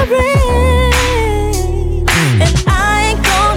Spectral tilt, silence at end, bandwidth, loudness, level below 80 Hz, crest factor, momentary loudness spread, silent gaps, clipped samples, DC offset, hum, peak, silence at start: -4.5 dB/octave; 0 s; 17 kHz; -12 LUFS; -18 dBFS; 12 dB; 5 LU; none; under 0.1%; under 0.1%; none; 0 dBFS; 0 s